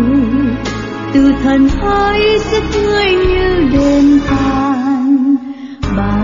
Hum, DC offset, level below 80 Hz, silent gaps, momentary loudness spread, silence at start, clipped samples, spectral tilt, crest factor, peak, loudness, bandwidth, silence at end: none; under 0.1%; -24 dBFS; none; 7 LU; 0 s; under 0.1%; -6.5 dB/octave; 10 dB; -2 dBFS; -12 LUFS; 7.6 kHz; 0 s